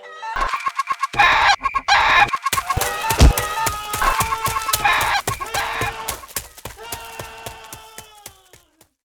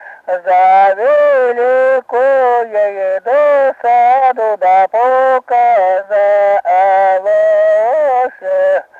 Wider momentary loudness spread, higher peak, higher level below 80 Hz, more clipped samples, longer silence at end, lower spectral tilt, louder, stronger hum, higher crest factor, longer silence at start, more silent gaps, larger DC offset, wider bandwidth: first, 20 LU vs 5 LU; about the same, -2 dBFS vs -2 dBFS; first, -28 dBFS vs -66 dBFS; neither; first, 0.75 s vs 0.2 s; second, -2.5 dB/octave vs -4 dB/octave; second, -18 LUFS vs -11 LUFS; neither; first, 18 dB vs 8 dB; about the same, 0 s vs 0 s; neither; neither; first, over 20 kHz vs 7.2 kHz